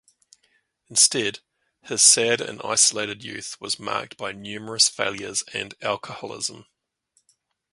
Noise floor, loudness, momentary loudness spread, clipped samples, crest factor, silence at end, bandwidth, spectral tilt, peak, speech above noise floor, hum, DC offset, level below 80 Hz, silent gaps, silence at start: -69 dBFS; -21 LUFS; 17 LU; under 0.1%; 24 dB; 1.1 s; 12 kHz; -0.5 dB/octave; -2 dBFS; 45 dB; none; under 0.1%; -68 dBFS; none; 0.9 s